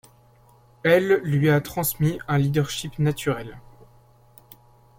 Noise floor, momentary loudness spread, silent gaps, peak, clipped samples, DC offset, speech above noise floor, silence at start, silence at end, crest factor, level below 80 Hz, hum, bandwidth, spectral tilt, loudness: -55 dBFS; 9 LU; none; -6 dBFS; under 0.1%; under 0.1%; 33 dB; 0.85 s; 1.4 s; 18 dB; -52 dBFS; none; 16.5 kHz; -6 dB/octave; -22 LUFS